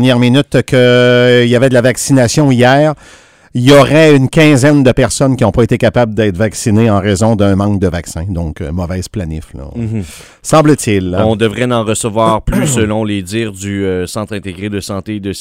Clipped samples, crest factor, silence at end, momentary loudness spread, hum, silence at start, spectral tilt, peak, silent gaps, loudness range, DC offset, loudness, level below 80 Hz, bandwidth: 0.6%; 10 dB; 0 s; 13 LU; none; 0 s; -5.5 dB/octave; 0 dBFS; none; 7 LU; under 0.1%; -11 LUFS; -32 dBFS; 16 kHz